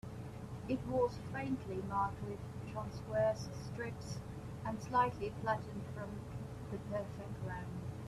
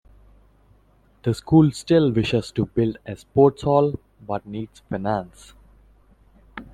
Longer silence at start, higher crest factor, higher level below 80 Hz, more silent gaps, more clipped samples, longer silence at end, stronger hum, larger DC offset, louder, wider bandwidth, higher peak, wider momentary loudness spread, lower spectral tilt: second, 0.05 s vs 1.25 s; about the same, 18 dB vs 20 dB; second, -58 dBFS vs -50 dBFS; neither; neither; about the same, 0 s vs 0.1 s; neither; neither; second, -40 LUFS vs -21 LUFS; first, 14 kHz vs 12 kHz; second, -22 dBFS vs -4 dBFS; second, 11 LU vs 18 LU; about the same, -7 dB/octave vs -7.5 dB/octave